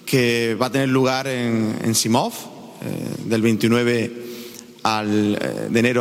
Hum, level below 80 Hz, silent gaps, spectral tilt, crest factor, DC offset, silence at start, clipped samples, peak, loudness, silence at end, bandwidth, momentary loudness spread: none; -60 dBFS; none; -4.5 dB/octave; 16 dB; under 0.1%; 0.05 s; under 0.1%; -6 dBFS; -20 LUFS; 0 s; 16.5 kHz; 16 LU